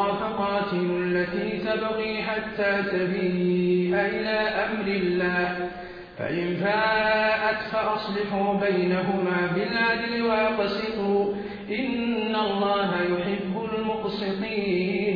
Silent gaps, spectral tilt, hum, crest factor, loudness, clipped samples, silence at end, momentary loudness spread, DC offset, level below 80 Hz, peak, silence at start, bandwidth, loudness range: none; -8 dB/octave; none; 14 dB; -25 LUFS; under 0.1%; 0 s; 6 LU; under 0.1%; -54 dBFS; -12 dBFS; 0 s; 5.2 kHz; 2 LU